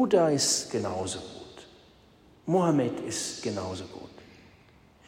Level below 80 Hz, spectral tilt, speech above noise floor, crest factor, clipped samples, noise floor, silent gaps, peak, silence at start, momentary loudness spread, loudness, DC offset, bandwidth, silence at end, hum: -64 dBFS; -4 dB/octave; 30 dB; 20 dB; under 0.1%; -58 dBFS; none; -10 dBFS; 0 s; 22 LU; -28 LUFS; under 0.1%; 16 kHz; 0.75 s; none